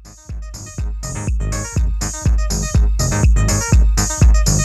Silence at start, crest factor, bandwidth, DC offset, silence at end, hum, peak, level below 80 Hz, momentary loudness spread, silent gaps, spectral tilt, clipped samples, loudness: 0 s; 14 dB; 13 kHz; under 0.1%; 0 s; none; -2 dBFS; -16 dBFS; 16 LU; none; -4.5 dB/octave; under 0.1%; -17 LUFS